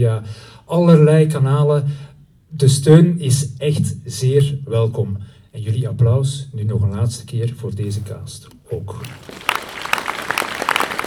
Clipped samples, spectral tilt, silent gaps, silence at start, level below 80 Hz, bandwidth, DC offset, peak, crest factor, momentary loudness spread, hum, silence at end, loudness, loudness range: under 0.1%; -6.5 dB/octave; none; 0 s; -50 dBFS; 16.5 kHz; under 0.1%; 0 dBFS; 18 dB; 20 LU; none; 0 s; -17 LUFS; 9 LU